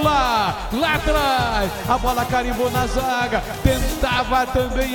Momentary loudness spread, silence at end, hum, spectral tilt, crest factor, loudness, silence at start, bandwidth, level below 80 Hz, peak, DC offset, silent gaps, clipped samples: 3 LU; 0 s; none; -4.5 dB/octave; 18 dB; -20 LUFS; 0 s; 17.5 kHz; -28 dBFS; 0 dBFS; under 0.1%; none; under 0.1%